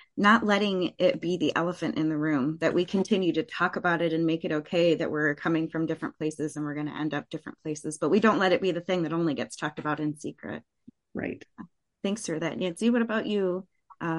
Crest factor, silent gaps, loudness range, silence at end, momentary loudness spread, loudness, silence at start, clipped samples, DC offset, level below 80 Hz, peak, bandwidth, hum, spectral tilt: 20 dB; none; 6 LU; 0 s; 13 LU; -27 LUFS; 0.15 s; under 0.1%; under 0.1%; -68 dBFS; -8 dBFS; 11.5 kHz; none; -5.5 dB/octave